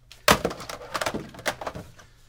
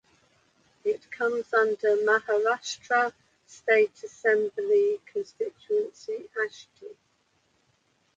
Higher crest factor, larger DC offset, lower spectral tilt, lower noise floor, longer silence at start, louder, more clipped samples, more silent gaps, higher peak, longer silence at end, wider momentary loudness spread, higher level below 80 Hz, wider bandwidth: first, 28 dB vs 20 dB; neither; about the same, -3 dB/octave vs -2.5 dB/octave; second, -46 dBFS vs -70 dBFS; second, 0.1 s vs 0.85 s; about the same, -27 LUFS vs -27 LUFS; neither; neither; first, -2 dBFS vs -8 dBFS; second, 0.25 s vs 1.25 s; first, 16 LU vs 12 LU; first, -48 dBFS vs -78 dBFS; first, 18 kHz vs 7.8 kHz